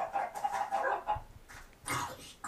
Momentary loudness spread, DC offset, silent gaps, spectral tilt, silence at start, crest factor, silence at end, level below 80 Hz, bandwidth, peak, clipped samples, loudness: 19 LU; under 0.1%; none; -3 dB/octave; 0 s; 16 dB; 0 s; -56 dBFS; 15.5 kHz; -20 dBFS; under 0.1%; -36 LUFS